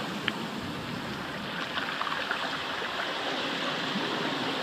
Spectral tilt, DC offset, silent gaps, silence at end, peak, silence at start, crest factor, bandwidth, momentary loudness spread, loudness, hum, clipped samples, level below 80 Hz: -3.5 dB/octave; under 0.1%; none; 0 s; -8 dBFS; 0 s; 24 dB; 15.5 kHz; 5 LU; -31 LUFS; none; under 0.1%; -62 dBFS